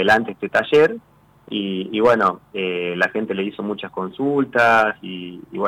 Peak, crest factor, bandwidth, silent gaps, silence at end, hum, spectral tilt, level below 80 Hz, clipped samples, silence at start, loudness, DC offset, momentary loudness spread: -6 dBFS; 14 dB; 13.5 kHz; none; 0 s; none; -5.5 dB/octave; -60 dBFS; under 0.1%; 0 s; -19 LUFS; under 0.1%; 14 LU